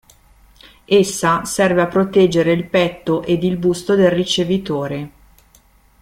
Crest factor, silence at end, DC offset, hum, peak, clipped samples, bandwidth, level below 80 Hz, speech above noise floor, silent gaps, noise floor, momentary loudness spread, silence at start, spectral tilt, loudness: 16 dB; 0.95 s; under 0.1%; none; -2 dBFS; under 0.1%; 16 kHz; -48 dBFS; 36 dB; none; -52 dBFS; 8 LU; 0.9 s; -5 dB/octave; -16 LUFS